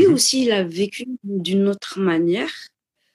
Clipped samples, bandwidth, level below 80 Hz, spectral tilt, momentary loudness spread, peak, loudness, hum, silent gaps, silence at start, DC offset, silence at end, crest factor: under 0.1%; 14.5 kHz; -66 dBFS; -4 dB/octave; 12 LU; -4 dBFS; -20 LUFS; none; none; 0 s; under 0.1%; 0.45 s; 16 dB